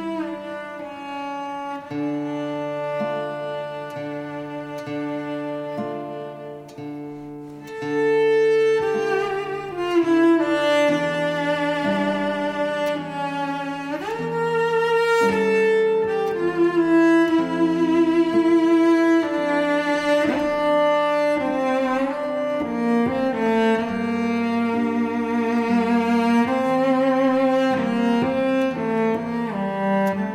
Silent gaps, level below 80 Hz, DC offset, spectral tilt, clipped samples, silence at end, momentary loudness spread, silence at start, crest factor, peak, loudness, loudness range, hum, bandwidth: none; -58 dBFS; under 0.1%; -6 dB/octave; under 0.1%; 0 s; 13 LU; 0 s; 12 dB; -8 dBFS; -21 LUFS; 10 LU; none; 13 kHz